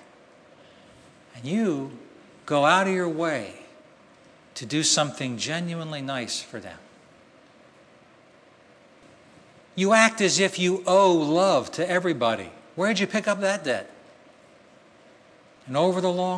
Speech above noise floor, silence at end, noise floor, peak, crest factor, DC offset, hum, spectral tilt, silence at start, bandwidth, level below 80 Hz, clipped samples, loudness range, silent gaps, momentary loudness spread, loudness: 31 dB; 0 s; -55 dBFS; -2 dBFS; 24 dB; under 0.1%; none; -3.5 dB/octave; 1.35 s; 11 kHz; -74 dBFS; under 0.1%; 11 LU; none; 19 LU; -23 LUFS